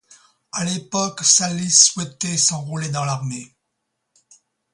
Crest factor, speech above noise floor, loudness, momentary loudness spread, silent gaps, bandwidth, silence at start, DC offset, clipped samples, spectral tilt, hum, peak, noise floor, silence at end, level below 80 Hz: 22 dB; 56 dB; -17 LUFS; 14 LU; none; 11.5 kHz; 0.55 s; under 0.1%; under 0.1%; -2 dB/octave; none; 0 dBFS; -76 dBFS; 1.25 s; -62 dBFS